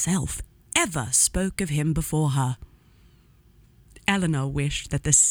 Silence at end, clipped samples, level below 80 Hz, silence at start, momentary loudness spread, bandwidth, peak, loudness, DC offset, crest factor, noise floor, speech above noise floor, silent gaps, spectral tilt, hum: 0 s; under 0.1%; -42 dBFS; 0 s; 9 LU; over 20 kHz; -2 dBFS; -24 LUFS; under 0.1%; 24 dB; -56 dBFS; 32 dB; none; -3.5 dB/octave; none